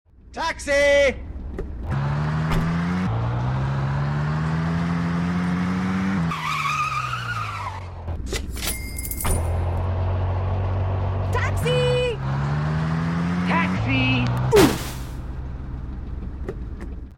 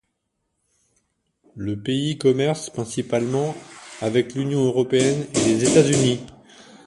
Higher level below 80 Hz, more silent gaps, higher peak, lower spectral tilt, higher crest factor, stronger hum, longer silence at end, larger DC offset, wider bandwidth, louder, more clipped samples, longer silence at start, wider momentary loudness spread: first, -34 dBFS vs -56 dBFS; neither; about the same, -4 dBFS vs -2 dBFS; about the same, -6 dB/octave vs -5 dB/octave; about the same, 20 dB vs 20 dB; neither; second, 0 s vs 0.55 s; neither; first, 17.5 kHz vs 11.5 kHz; about the same, -23 LUFS vs -21 LUFS; neither; second, 0.25 s vs 1.55 s; about the same, 14 LU vs 13 LU